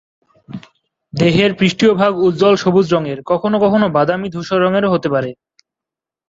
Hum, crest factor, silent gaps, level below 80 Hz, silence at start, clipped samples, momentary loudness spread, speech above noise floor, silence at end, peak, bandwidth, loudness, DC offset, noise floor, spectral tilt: none; 14 dB; none; -52 dBFS; 0.5 s; under 0.1%; 15 LU; 73 dB; 0.95 s; -2 dBFS; 7.8 kHz; -14 LUFS; under 0.1%; -86 dBFS; -6.5 dB/octave